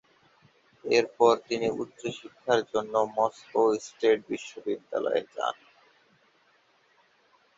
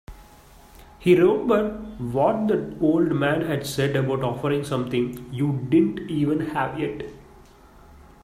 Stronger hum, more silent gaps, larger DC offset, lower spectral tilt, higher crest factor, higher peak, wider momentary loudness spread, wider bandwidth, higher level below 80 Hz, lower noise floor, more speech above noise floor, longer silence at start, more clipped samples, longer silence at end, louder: neither; neither; neither; second, -4 dB/octave vs -7 dB/octave; about the same, 22 dB vs 18 dB; about the same, -8 dBFS vs -6 dBFS; first, 13 LU vs 10 LU; second, 7.8 kHz vs 15 kHz; second, -72 dBFS vs -50 dBFS; first, -65 dBFS vs -49 dBFS; first, 38 dB vs 27 dB; first, 0.85 s vs 0.1 s; neither; first, 2.05 s vs 0.25 s; second, -28 LUFS vs -23 LUFS